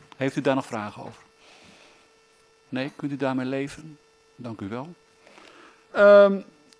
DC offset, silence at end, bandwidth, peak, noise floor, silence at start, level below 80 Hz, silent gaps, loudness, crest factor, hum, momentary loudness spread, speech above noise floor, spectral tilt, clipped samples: under 0.1%; 0.35 s; 11 kHz; -4 dBFS; -59 dBFS; 0.2 s; -70 dBFS; none; -22 LUFS; 22 dB; none; 26 LU; 37 dB; -6.5 dB/octave; under 0.1%